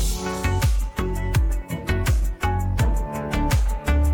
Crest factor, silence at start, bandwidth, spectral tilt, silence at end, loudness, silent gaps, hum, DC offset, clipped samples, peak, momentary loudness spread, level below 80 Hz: 12 dB; 0 s; 17.5 kHz; -5.5 dB/octave; 0 s; -24 LUFS; none; none; under 0.1%; under 0.1%; -10 dBFS; 5 LU; -24 dBFS